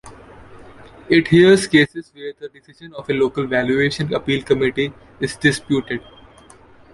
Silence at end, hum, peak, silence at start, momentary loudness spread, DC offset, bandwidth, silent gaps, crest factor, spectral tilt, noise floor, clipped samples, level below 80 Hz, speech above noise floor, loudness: 0.95 s; none; -2 dBFS; 0.05 s; 20 LU; under 0.1%; 11.5 kHz; none; 18 dB; -5.5 dB/octave; -46 dBFS; under 0.1%; -50 dBFS; 28 dB; -17 LUFS